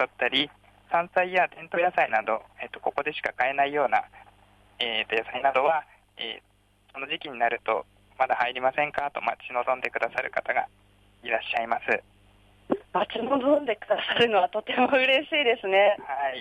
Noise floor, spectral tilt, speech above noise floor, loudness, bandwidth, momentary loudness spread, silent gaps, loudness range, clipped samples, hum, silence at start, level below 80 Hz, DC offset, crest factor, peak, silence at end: -58 dBFS; -5 dB/octave; 32 dB; -26 LUFS; 10.5 kHz; 11 LU; none; 5 LU; under 0.1%; 50 Hz at -65 dBFS; 0 s; -66 dBFS; under 0.1%; 18 dB; -10 dBFS; 0 s